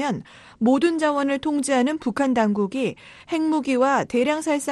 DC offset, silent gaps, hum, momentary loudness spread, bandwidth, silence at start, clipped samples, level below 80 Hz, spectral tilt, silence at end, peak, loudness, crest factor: under 0.1%; none; none; 8 LU; 12.5 kHz; 0 s; under 0.1%; -60 dBFS; -5 dB/octave; 0 s; -6 dBFS; -22 LUFS; 14 dB